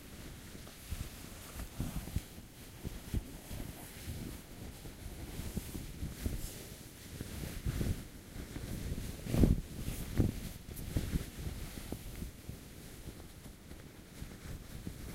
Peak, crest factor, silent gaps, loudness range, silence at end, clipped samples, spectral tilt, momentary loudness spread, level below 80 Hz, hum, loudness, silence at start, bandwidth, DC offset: -12 dBFS; 28 dB; none; 9 LU; 0 s; under 0.1%; -5.5 dB/octave; 13 LU; -44 dBFS; none; -42 LUFS; 0 s; 16 kHz; under 0.1%